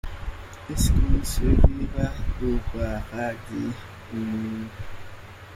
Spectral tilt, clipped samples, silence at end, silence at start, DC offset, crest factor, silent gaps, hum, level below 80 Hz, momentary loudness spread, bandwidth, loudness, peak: -6 dB/octave; under 0.1%; 0 s; 0.05 s; under 0.1%; 20 dB; none; none; -26 dBFS; 18 LU; 16 kHz; -27 LUFS; -4 dBFS